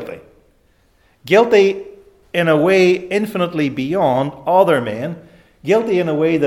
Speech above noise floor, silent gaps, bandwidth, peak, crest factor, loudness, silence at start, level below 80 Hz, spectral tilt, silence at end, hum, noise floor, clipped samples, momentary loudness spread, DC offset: 42 dB; none; 15 kHz; 0 dBFS; 16 dB; -16 LUFS; 0 s; -56 dBFS; -6.5 dB/octave; 0 s; none; -57 dBFS; under 0.1%; 14 LU; under 0.1%